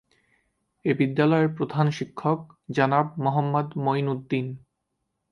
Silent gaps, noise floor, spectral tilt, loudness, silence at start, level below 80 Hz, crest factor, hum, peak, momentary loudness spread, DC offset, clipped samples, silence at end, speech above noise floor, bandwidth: none; -79 dBFS; -8 dB/octave; -25 LUFS; 0.85 s; -68 dBFS; 20 dB; none; -6 dBFS; 9 LU; under 0.1%; under 0.1%; 0.75 s; 55 dB; 7 kHz